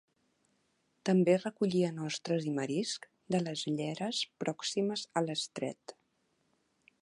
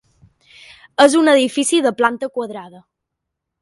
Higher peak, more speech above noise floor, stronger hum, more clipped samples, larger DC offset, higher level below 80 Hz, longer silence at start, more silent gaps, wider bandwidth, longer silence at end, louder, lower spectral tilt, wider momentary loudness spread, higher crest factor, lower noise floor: second, -14 dBFS vs 0 dBFS; second, 44 dB vs 64 dB; neither; neither; neither; second, -82 dBFS vs -66 dBFS; about the same, 1.05 s vs 1 s; neither; about the same, 11 kHz vs 11.5 kHz; first, 1.1 s vs 0.95 s; second, -34 LUFS vs -15 LUFS; first, -5 dB/octave vs -2.5 dB/octave; second, 10 LU vs 16 LU; about the same, 20 dB vs 18 dB; about the same, -77 dBFS vs -79 dBFS